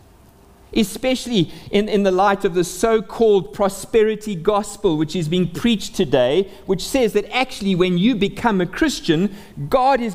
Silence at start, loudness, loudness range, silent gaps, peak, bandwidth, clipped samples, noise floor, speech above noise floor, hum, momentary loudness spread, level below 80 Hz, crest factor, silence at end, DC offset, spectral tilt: 0.7 s; -19 LUFS; 1 LU; none; -2 dBFS; 16 kHz; under 0.1%; -48 dBFS; 30 dB; none; 5 LU; -42 dBFS; 16 dB; 0 s; under 0.1%; -5.5 dB/octave